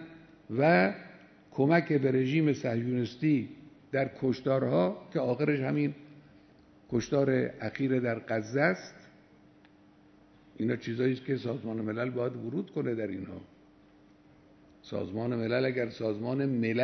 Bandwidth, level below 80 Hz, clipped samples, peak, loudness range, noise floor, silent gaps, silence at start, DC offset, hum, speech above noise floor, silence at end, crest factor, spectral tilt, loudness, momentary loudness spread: 6.4 kHz; -68 dBFS; under 0.1%; -10 dBFS; 7 LU; -59 dBFS; none; 0 s; under 0.1%; none; 30 dB; 0 s; 20 dB; -7.5 dB/octave; -30 LUFS; 11 LU